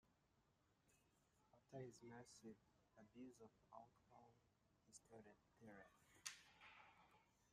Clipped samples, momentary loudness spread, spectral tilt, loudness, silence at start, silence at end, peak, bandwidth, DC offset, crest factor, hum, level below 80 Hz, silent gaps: under 0.1%; 11 LU; -3.5 dB/octave; -63 LUFS; 0.05 s; 0 s; -32 dBFS; 13.5 kHz; under 0.1%; 34 dB; none; under -90 dBFS; none